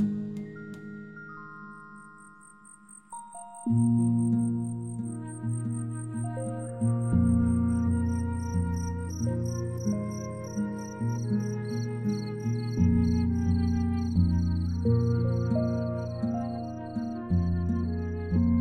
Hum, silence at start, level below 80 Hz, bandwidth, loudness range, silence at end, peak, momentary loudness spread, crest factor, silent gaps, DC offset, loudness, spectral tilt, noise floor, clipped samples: none; 0 s; -44 dBFS; 9.4 kHz; 5 LU; 0 s; -12 dBFS; 18 LU; 16 dB; none; under 0.1%; -29 LUFS; -8 dB/octave; -53 dBFS; under 0.1%